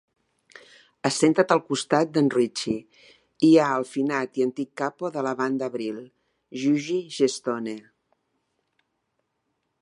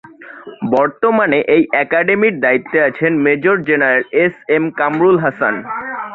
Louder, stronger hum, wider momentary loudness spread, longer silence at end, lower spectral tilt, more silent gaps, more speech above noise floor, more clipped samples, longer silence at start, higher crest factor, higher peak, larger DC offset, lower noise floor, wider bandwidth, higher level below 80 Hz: second, -24 LUFS vs -14 LUFS; neither; first, 12 LU vs 7 LU; first, 2 s vs 0 s; second, -5 dB/octave vs -9 dB/octave; neither; first, 53 dB vs 21 dB; neither; first, 1.05 s vs 0.2 s; first, 22 dB vs 14 dB; second, -4 dBFS vs 0 dBFS; neither; first, -76 dBFS vs -35 dBFS; first, 11.5 kHz vs 4.4 kHz; second, -72 dBFS vs -58 dBFS